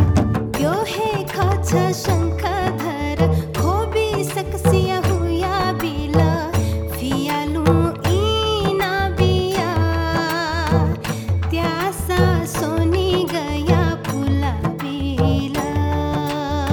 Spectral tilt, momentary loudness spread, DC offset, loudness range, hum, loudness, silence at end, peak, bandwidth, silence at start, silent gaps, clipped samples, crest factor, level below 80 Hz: -6 dB/octave; 5 LU; under 0.1%; 1 LU; none; -20 LUFS; 0 s; -2 dBFS; 19 kHz; 0 s; none; under 0.1%; 16 dB; -32 dBFS